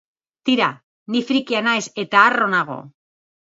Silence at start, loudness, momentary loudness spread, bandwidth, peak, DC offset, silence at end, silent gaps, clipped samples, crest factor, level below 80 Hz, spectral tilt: 0.45 s; -18 LUFS; 11 LU; 8 kHz; 0 dBFS; under 0.1%; 0.7 s; 0.83-1.06 s; under 0.1%; 20 dB; -72 dBFS; -3.5 dB/octave